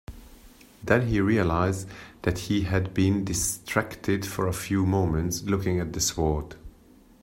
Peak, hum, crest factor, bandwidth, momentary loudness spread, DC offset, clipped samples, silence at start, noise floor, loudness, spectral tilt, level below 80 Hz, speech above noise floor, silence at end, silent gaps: -4 dBFS; none; 22 dB; 16.5 kHz; 8 LU; under 0.1%; under 0.1%; 0.1 s; -54 dBFS; -26 LUFS; -5 dB/octave; -44 dBFS; 29 dB; 0.55 s; none